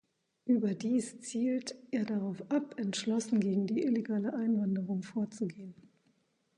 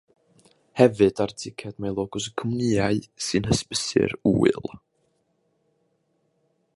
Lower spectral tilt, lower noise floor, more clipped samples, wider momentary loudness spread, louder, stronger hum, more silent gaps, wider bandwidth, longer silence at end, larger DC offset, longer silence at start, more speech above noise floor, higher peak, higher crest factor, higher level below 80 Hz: about the same, -6 dB/octave vs -5 dB/octave; first, -74 dBFS vs -70 dBFS; neither; second, 8 LU vs 12 LU; second, -33 LUFS vs -24 LUFS; neither; neither; about the same, 11 kHz vs 11.5 kHz; second, 0.85 s vs 2 s; neither; second, 0.45 s vs 0.75 s; second, 41 dB vs 47 dB; second, -18 dBFS vs -2 dBFS; second, 16 dB vs 24 dB; second, -80 dBFS vs -50 dBFS